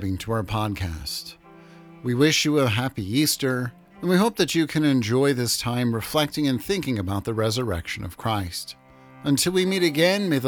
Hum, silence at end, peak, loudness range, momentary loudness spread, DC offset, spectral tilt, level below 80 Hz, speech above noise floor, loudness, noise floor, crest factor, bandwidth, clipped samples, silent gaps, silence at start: none; 0 s; -6 dBFS; 4 LU; 12 LU; under 0.1%; -4.5 dB/octave; -50 dBFS; 24 dB; -23 LUFS; -47 dBFS; 18 dB; over 20 kHz; under 0.1%; none; 0 s